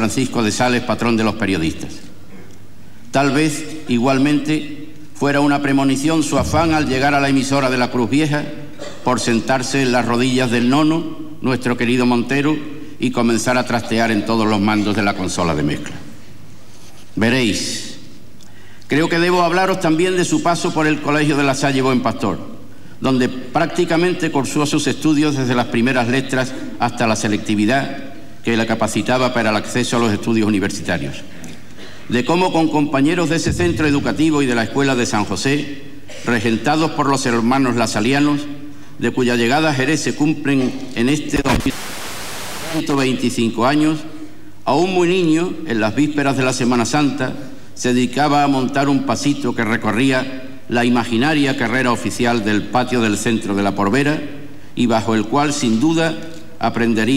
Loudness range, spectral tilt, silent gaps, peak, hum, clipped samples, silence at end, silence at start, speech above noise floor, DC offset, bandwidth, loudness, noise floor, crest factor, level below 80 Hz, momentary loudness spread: 3 LU; -5 dB/octave; none; -4 dBFS; none; under 0.1%; 0 s; 0 s; 26 dB; 4%; 16 kHz; -17 LUFS; -43 dBFS; 14 dB; -44 dBFS; 11 LU